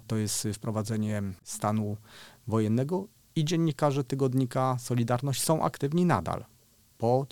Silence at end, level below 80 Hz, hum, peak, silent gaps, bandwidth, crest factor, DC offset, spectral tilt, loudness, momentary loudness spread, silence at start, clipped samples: 0.05 s; -62 dBFS; none; -10 dBFS; none; 19 kHz; 20 dB; 0.1%; -6 dB/octave; -29 LUFS; 9 LU; 0.05 s; under 0.1%